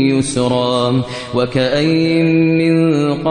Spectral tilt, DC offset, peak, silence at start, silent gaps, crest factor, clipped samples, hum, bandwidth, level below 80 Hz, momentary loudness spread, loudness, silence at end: -6 dB/octave; under 0.1%; -2 dBFS; 0 s; none; 12 dB; under 0.1%; none; 10 kHz; -46 dBFS; 5 LU; -14 LUFS; 0 s